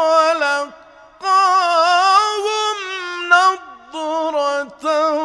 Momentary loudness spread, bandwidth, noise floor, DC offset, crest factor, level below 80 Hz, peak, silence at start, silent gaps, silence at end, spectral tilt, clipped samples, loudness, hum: 12 LU; 11 kHz; -43 dBFS; under 0.1%; 16 dB; -64 dBFS; 0 dBFS; 0 s; none; 0 s; 0 dB/octave; under 0.1%; -16 LUFS; none